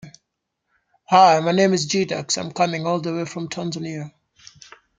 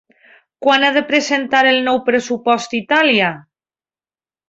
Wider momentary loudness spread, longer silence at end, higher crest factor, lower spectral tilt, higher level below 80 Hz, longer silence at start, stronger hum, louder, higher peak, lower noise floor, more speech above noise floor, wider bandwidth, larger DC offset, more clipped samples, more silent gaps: first, 15 LU vs 6 LU; second, 0.9 s vs 1.1 s; about the same, 20 dB vs 16 dB; first, -4.5 dB/octave vs -3 dB/octave; about the same, -66 dBFS vs -64 dBFS; second, 0.05 s vs 0.6 s; neither; second, -20 LUFS vs -15 LUFS; about the same, -2 dBFS vs -2 dBFS; second, -78 dBFS vs under -90 dBFS; second, 58 dB vs over 75 dB; first, 9.6 kHz vs 8 kHz; neither; neither; neither